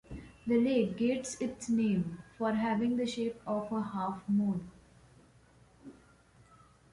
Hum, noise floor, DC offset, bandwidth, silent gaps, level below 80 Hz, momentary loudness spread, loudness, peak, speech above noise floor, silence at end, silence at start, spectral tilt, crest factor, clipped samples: none; -62 dBFS; under 0.1%; 11.5 kHz; none; -62 dBFS; 9 LU; -33 LUFS; -18 dBFS; 30 dB; 1 s; 0.1 s; -6 dB/octave; 16 dB; under 0.1%